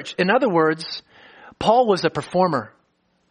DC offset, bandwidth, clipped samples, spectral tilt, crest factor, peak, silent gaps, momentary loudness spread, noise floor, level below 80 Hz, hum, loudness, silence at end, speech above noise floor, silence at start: under 0.1%; 10 kHz; under 0.1%; -5.5 dB/octave; 18 dB; -4 dBFS; none; 13 LU; -66 dBFS; -56 dBFS; none; -20 LUFS; 0.6 s; 47 dB; 0 s